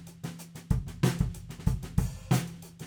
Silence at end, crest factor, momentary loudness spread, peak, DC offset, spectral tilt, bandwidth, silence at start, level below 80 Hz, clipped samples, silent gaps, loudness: 0 s; 20 dB; 13 LU; -10 dBFS; under 0.1%; -6 dB/octave; over 20 kHz; 0 s; -38 dBFS; under 0.1%; none; -32 LUFS